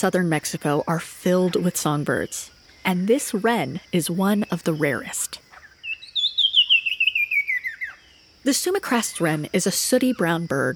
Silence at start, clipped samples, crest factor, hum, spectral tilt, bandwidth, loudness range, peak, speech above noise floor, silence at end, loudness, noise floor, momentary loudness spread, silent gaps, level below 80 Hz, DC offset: 0 s; under 0.1%; 16 dB; none; -3.5 dB/octave; 19.5 kHz; 3 LU; -6 dBFS; 30 dB; 0 s; -21 LUFS; -52 dBFS; 12 LU; none; -60 dBFS; under 0.1%